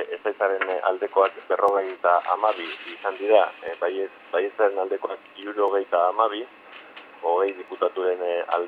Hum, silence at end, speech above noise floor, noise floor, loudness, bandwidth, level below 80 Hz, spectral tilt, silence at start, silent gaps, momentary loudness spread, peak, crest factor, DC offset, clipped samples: none; 0 s; 21 dB; -44 dBFS; -24 LUFS; 4.8 kHz; -82 dBFS; -4.5 dB/octave; 0 s; none; 12 LU; -4 dBFS; 20 dB; under 0.1%; under 0.1%